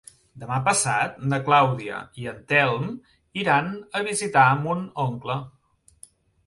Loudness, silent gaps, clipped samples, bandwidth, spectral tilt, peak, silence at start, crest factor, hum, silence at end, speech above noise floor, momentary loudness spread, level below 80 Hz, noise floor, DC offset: -23 LUFS; none; under 0.1%; 11.5 kHz; -4 dB/octave; -4 dBFS; 0.35 s; 20 dB; none; 0.95 s; 30 dB; 15 LU; -60 dBFS; -53 dBFS; under 0.1%